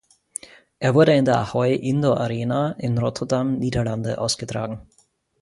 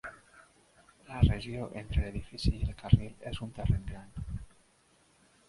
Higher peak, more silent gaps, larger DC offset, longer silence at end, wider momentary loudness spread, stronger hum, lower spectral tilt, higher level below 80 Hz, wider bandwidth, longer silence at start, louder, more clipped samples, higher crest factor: first, -4 dBFS vs -8 dBFS; neither; neither; second, 0.6 s vs 1 s; about the same, 17 LU vs 16 LU; neither; second, -6 dB/octave vs -7.5 dB/octave; second, -50 dBFS vs -38 dBFS; about the same, 11.5 kHz vs 11.5 kHz; first, 0.8 s vs 0.05 s; first, -21 LUFS vs -33 LUFS; neither; second, 18 dB vs 26 dB